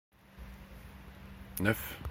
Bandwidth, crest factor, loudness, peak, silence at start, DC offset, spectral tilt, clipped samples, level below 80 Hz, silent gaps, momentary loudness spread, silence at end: 16.5 kHz; 28 dB; -34 LUFS; -12 dBFS; 0.2 s; under 0.1%; -5 dB/octave; under 0.1%; -52 dBFS; none; 19 LU; 0 s